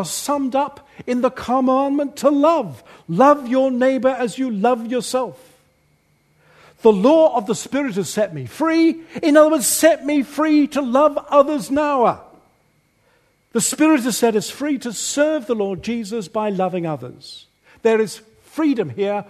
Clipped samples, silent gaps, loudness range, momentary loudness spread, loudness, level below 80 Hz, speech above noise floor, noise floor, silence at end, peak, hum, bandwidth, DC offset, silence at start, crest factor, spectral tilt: under 0.1%; none; 6 LU; 11 LU; -18 LUFS; -60 dBFS; 43 dB; -61 dBFS; 0.05 s; 0 dBFS; none; 13.5 kHz; under 0.1%; 0 s; 18 dB; -4.5 dB/octave